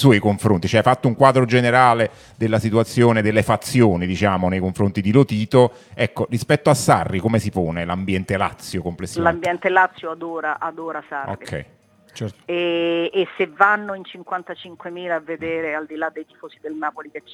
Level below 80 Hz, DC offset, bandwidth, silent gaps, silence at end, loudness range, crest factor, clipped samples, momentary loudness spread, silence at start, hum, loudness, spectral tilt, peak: -54 dBFS; under 0.1%; 16 kHz; none; 0 s; 8 LU; 20 dB; under 0.1%; 14 LU; 0 s; none; -19 LUFS; -6 dB/octave; 0 dBFS